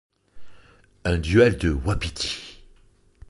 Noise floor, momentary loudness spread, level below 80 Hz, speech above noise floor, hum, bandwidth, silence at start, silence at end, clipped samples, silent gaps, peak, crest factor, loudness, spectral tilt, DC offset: -56 dBFS; 14 LU; -36 dBFS; 35 dB; none; 11.5 kHz; 0.35 s; 0.75 s; under 0.1%; none; -4 dBFS; 20 dB; -23 LUFS; -5.5 dB/octave; under 0.1%